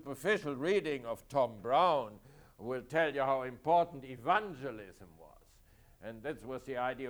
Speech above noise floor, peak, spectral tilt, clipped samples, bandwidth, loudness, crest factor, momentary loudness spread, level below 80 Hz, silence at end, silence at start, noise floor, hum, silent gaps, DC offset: 29 dB; -16 dBFS; -5.5 dB/octave; under 0.1%; over 20 kHz; -34 LUFS; 18 dB; 15 LU; -64 dBFS; 0 s; 0.05 s; -63 dBFS; none; none; under 0.1%